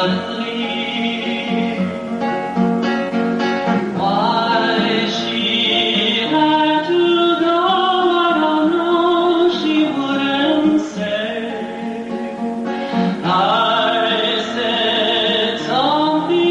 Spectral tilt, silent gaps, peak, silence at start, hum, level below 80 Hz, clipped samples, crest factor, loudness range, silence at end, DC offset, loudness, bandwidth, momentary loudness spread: -5.5 dB/octave; none; -4 dBFS; 0 s; none; -56 dBFS; under 0.1%; 12 dB; 5 LU; 0 s; under 0.1%; -17 LUFS; 9.4 kHz; 8 LU